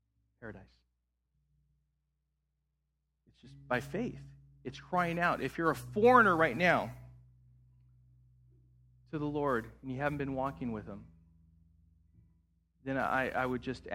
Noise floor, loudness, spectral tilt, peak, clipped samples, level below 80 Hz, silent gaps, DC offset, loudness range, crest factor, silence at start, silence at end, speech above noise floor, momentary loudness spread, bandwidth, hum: -82 dBFS; -32 LUFS; -6.5 dB/octave; -10 dBFS; under 0.1%; -60 dBFS; none; under 0.1%; 13 LU; 26 dB; 0.4 s; 0 s; 50 dB; 23 LU; 16 kHz; 60 Hz at -60 dBFS